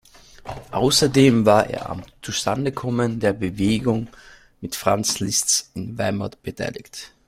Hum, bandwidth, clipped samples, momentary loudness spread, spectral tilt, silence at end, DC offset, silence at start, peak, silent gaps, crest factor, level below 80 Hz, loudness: none; 16 kHz; under 0.1%; 19 LU; -4 dB/octave; 0.2 s; under 0.1%; 0.45 s; -2 dBFS; none; 20 dB; -48 dBFS; -21 LUFS